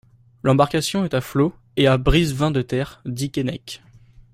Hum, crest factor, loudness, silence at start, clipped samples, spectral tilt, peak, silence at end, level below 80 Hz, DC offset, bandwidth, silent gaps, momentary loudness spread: none; 18 dB; -21 LUFS; 0.45 s; under 0.1%; -6 dB/octave; -2 dBFS; 0.1 s; -34 dBFS; under 0.1%; 16 kHz; none; 11 LU